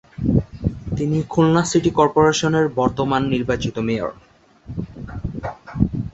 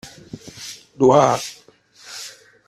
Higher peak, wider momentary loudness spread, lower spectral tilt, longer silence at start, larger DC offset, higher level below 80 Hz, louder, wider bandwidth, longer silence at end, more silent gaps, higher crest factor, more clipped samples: about the same, -2 dBFS vs -2 dBFS; second, 15 LU vs 24 LU; about the same, -6 dB/octave vs -5 dB/octave; first, 0.2 s vs 0.05 s; neither; first, -36 dBFS vs -58 dBFS; second, -20 LUFS vs -16 LUFS; second, 8.2 kHz vs 14 kHz; second, 0.05 s vs 0.4 s; neither; about the same, 18 dB vs 20 dB; neither